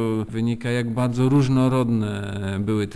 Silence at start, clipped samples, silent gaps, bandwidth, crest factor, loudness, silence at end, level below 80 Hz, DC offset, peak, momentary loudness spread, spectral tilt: 0 s; under 0.1%; none; 11 kHz; 14 dB; -22 LUFS; 0 s; -46 dBFS; under 0.1%; -8 dBFS; 8 LU; -7.5 dB/octave